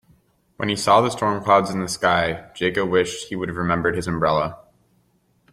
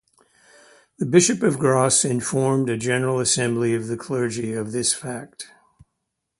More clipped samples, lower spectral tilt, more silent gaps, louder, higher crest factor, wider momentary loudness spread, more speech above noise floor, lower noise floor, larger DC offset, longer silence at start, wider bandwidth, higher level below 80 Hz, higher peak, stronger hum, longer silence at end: neither; about the same, -4.5 dB/octave vs -4 dB/octave; neither; about the same, -21 LUFS vs -21 LUFS; about the same, 20 dB vs 22 dB; second, 9 LU vs 14 LU; second, 43 dB vs 57 dB; second, -63 dBFS vs -78 dBFS; neither; second, 0.6 s vs 1 s; first, 16 kHz vs 11.5 kHz; first, -52 dBFS vs -60 dBFS; about the same, -2 dBFS vs 0 dBFS; neither; about the same, 0.95 s vs 0.95 s